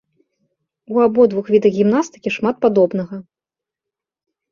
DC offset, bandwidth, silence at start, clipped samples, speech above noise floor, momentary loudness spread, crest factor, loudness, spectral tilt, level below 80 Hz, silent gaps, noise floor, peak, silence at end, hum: under 0.1%; 7.2 kHz; 0.9 s; under 0.1%; 72 dB; 10 LU; 16 dB; -16 LUFS; -7 dB/octave; -62 dBFS; none; -87 dBFS; -2 dBFS; 1.3 s; none